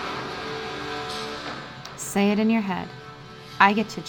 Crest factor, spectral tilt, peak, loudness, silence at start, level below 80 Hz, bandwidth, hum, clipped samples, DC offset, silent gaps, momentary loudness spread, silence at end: 24 dB; -4.5 dB/octave; 0 dBFS; -25 LUFS; 0 s; -56 dBFS; 18 kHz; none; under 0.1%; under 0.1%; none; 20 LU; 0 s